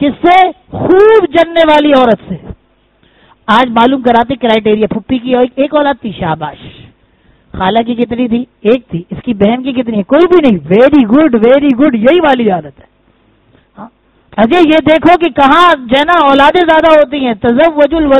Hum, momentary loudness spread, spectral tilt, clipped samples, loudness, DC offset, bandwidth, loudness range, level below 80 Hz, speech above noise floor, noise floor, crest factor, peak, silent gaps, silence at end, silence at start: none; 10 LU; -7 dB/octave; 1%; -8 LUFS; under 0.1%; 9.4 kHz; 7 LU; -38 dBFS; 43 dB; -51 dBFS; 8 dB; 0 dBFS; none; 0 s; 0 s